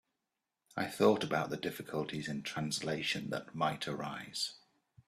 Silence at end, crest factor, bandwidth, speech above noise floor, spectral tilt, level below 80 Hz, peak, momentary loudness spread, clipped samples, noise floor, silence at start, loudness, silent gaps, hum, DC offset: 0.5 s; 22 dB; 15 kHz; 53 dB; -4.5 dB/octave; -72 dBFS; -14 dBFS; 11 LU; under 0.1%; -88 dBFS; 0.75 s; -36 LUFS; none; none; under 0.1%